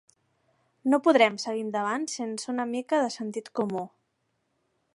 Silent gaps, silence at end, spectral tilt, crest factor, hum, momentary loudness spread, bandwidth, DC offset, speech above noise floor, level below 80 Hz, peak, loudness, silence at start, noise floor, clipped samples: none; 1.05 s; -4 dB/octave; 22 dB; none; 12 LU; 11.5 kHz; under 0.1%; 50 dB; -82 dBFS; -6 dBFS; -27 LUFS; 0.85 s; -76 dBFS; under 0.1%